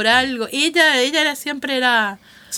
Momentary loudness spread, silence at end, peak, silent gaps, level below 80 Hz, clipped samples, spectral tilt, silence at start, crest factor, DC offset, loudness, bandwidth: 8 LU; 0 s; 0 dBFS; none; -56 dBFS; under 0.1%; -1 dB/octave; 0 s; 18 dB; under 0.1%; -17 LUFS; 19.5 kHz